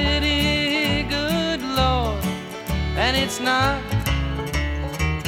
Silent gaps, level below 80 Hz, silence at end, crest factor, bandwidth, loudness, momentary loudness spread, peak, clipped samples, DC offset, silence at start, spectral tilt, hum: none; -30 dBFS; 0 s; 18 dB; 17 kHz; -22 LUFS; 7 LU; -4 dBFS; under 0.1%; under 0.1%; 0 s; -4.5 dB/octave; none